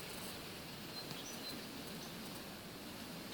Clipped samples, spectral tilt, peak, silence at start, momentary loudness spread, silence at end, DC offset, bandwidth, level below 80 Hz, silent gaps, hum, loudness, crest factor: under 0.1%; -3 dB/octave; -28 dBFS; 0 s; 3 LU; 0 s; under 0.1%; 19 kHz; -68 dBFS; none; none; -47 LUFS; 20 dB